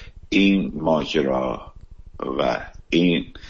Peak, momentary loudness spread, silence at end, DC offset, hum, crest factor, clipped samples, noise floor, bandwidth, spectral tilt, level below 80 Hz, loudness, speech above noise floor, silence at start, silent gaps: -6 dBFS; 11 LU; 0 s; under 0.1%; none; 16 dB; under 0.1%; -41 dBFS; 7.4 kHz; -6.5 dB/octave; -42 dBFS; -21 LUFS; 20 dB; 0 s; none